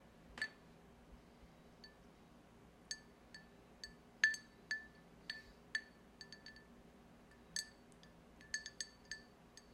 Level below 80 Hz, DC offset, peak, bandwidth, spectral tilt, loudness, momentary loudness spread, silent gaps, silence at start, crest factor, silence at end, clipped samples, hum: -72 dBFS; under 0.1%; -18 dBFS; 15.5 kHz; -0.5 dB/octave; -45 LUFS; 18 LU; none; 0 s; 32 dB; 0 s; under 0.1%; 60 Hz at -75 dBFS